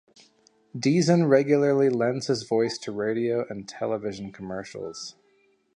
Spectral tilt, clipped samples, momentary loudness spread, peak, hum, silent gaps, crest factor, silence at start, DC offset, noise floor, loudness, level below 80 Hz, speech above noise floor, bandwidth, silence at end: -6 dB/octave; under 0.1%; 16 LU; -6 dBFS; none; none; 20 dB; 0.75 s; under 0.1%; -65 dBFS; -25 LUFS; -66 dBFS; 41 dB; 10.5 kHz; 0.65 s